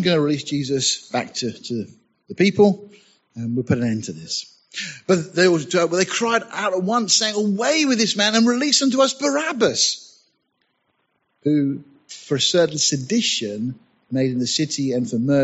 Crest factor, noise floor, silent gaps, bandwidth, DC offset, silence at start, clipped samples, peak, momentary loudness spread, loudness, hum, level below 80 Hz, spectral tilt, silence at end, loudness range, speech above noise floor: 18 dB; -70 dBFS; none; 8.2 kHz; under 0.1%; 0 s; under 0.1%; -2 dBFS; 12 LU; -20 LUFS; none; -64 dBFS; -3.5 dB/octave; 0 s; 5 LU; 50 dB